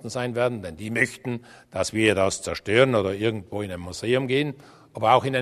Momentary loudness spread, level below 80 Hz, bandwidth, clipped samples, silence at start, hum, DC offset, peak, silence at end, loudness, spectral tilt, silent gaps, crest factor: 13 LU; -56 dBFS; 13.5 kHz; under 0.1%; 0.05 s; none; under 0.1%; -2 dBFS; 0 s; -24 LUFS; -5 dB/octave; none; 22 dB